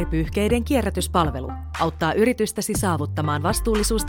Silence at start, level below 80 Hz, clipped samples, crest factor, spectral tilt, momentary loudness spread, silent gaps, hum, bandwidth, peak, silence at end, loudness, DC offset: 0 s; -32 dBFS; under 0.1%; 16 dB; -5 dB/octave; 5 LU; none; none; 19 kHz; -6 dBFS; 0 s; -22 LUFS; under 0.1%